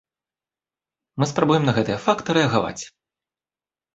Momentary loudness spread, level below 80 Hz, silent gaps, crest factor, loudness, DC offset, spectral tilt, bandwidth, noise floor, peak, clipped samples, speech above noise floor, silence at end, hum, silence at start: 17 LU; -56 dBFS; none; 22 dB; -21 LUFS; under 0.1%; -5.5 dB/octave; 8 kHz; under -90 dBFS; -2 dBFS; under 0.1%; over 70 dB; 1.05 s; none; 1.15 s